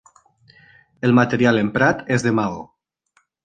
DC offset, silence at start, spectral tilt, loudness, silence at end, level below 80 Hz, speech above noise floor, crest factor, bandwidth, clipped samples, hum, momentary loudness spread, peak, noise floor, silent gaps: under 0.1%; 1.05 s; -6.5 dB/octave; -18 LUFS; 0.8 s; -54 dBFS; 47 dB; 18 dB; 9.2 kHz; under 0.1%; none; 8 LU; -2 dBFS; -65 dBFS; none